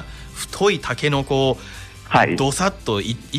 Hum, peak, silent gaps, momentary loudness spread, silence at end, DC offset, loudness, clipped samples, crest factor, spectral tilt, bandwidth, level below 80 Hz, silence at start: none; -4 dBFS; none; 14 LU; 0 s; under 0.1%; -20 LUFS; under 0.1%; 16 dB; -4.5 dB/octave; 15.5 kHz; -40 dBFS; 0 s